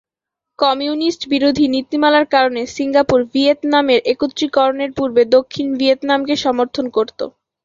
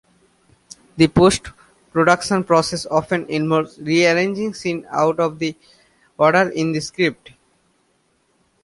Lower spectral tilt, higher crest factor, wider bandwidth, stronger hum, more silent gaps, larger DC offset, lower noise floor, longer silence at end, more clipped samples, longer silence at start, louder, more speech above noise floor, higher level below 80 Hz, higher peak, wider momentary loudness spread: about the same, -4.5 dB/octave vs -5 dB/octave; about the same, 14 dB vs 18 dB; second, 7.6 kHz vs 11.5 kHz; neither; neither; neither; first, -83 dBFS vs -63 dBFS; second, 0.35 s vs 1.5 s; neither; second, 0.6 s vs 0.95 s; about the same, -16 LUFS vs -18 LUFS; first, 68 dB vs 46 dB; about the same, -52 dBFS vs -48 dBFS; about the same, -2 dBFS vs -2 dBFS; second, 6 LU vs 9 LU